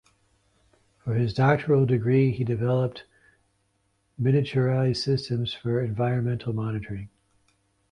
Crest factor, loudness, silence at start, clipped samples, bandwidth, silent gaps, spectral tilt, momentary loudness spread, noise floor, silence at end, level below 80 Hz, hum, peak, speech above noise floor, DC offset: 18 dB; -25 LUFS; 1.05 s; under 0.1%; 9.8 kHz; none; -8 dB/octave; 11 LU; -71 dBFS; 0.85 s; -54 dBFS; none; -8 dBFS; 47 dB; under 0.1%